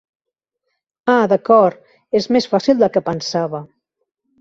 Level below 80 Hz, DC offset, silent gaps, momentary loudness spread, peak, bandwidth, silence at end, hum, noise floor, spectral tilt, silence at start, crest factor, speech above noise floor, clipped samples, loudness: -60 dBFS; under 0.1%; none; 10 LU; -2 dBFS; 7.8 kHz; 0.75 s; none; -79 dBFS; -5.5 dB/octave; 1.05 s; 16 dB; 64 dB; under 0.1%; -16 LUFS